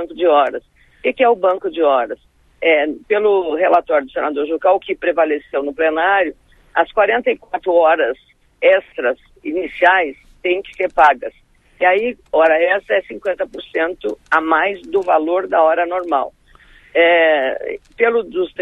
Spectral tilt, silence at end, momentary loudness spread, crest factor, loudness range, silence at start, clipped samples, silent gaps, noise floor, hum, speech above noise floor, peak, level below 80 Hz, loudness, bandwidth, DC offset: -5 dB/octave; 0 s; 10 LU; 16 dB; 1 LU; 0 s; under 0.1%; none; -47 dBFS; none; 31 dB; 0 dBFS; -52 dBFS; -16 LUFS; 6.6 kHz; under 0.1%